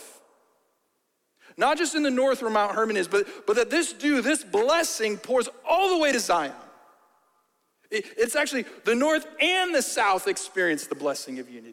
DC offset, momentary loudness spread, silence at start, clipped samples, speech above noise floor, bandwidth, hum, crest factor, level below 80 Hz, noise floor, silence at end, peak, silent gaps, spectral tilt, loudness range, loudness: under 0.1%; 7 LU; 0 s; under 0.1%; 49 dB; 16.5 kHz; none; 16 dB; -68 dBFS; -74 dBFS; 0 s; -8 dBFS; none; -2 dB/octave; 3 LU; -24 LUFS